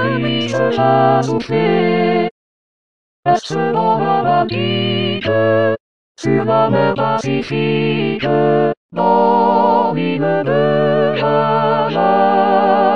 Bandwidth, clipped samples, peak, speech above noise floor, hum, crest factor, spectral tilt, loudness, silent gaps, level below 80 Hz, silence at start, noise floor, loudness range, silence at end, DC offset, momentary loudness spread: 9.2 kHz; under 0.1%; 0 dBFS; over 76 dB; none; 14 dB; -7 dB/octave; -15 LUFS; 2.31-3.23 s, 5.80-6.15 s, 8.77-8.89 s; -56 dBFS; 0 s; under -90 dBFS; 3 LU; 0 s; 1%; 5 LU